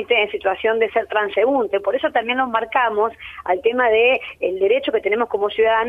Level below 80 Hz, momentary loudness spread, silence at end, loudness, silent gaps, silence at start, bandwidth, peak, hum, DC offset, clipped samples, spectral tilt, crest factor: -54 dBFS; 5 LU; 0 s; -19 LUFS; none; 0 s; 3.9 kHz; -4 dBFS; none; under 0.1%; under 0.1%; -5.5 dB/octave; 14 dB